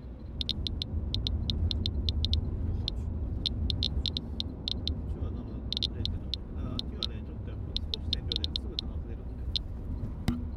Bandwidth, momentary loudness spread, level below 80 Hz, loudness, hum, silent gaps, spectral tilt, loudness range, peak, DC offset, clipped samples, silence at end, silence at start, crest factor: 11.5 kHz; 7 LU; -36 dBFS; -34 LUFS; none; none; -6 dB/octave; 3 LU; -12 dBFS; under 0.1%; under 0.1%; 0 s; 0 s; 22 dB